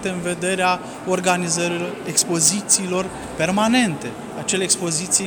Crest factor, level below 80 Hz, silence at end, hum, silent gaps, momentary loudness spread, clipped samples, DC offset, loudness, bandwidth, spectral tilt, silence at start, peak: 14 dB; -52 dBFS; 0 s; none; none; 9 LU; under 0.1%; under 0.1%; -19 LUFS; over 20 kHz; -3 dB/octave; 0 s; -6 dBFS